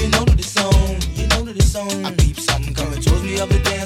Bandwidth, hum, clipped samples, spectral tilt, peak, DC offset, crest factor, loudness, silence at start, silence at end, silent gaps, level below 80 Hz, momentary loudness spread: 16 kHz; none; under 0.1%; -4.5 dB/octave; -2 dBFS; under 0.1%; 14 dB; -18 LUFS; 0 s; 0 s; none; -20 dBFS; 6 LU